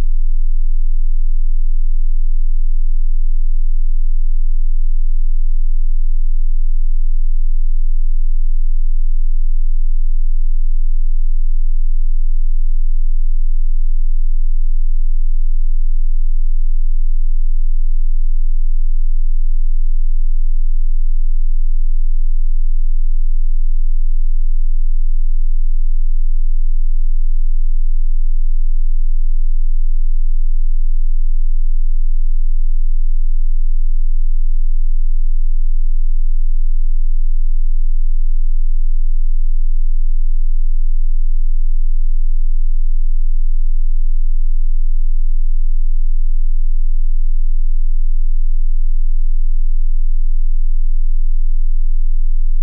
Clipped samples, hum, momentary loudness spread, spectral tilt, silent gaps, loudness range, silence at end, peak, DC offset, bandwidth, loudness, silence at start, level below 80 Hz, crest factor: under 0.1%; none; 0 LU; -22.5 dB/octave; none; 0 LU; 0 s; -6 dBFS; under 0.1%; 0.2 kHz; -23 LUFS; 0 s; -10 dBFS; 4 dB